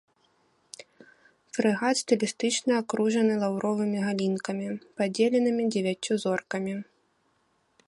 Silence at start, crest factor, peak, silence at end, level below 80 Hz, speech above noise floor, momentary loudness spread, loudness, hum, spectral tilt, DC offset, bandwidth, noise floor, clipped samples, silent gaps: 0.8 s; 18 dB; -10 dBFS; 1.05 s; -74 dBFS; 44 dB; 12 LU; -27 LUFS; none; -4.5 dB/octave; under 0.1%; 11.5 kHz; -70 dBFS; under 0.1%; none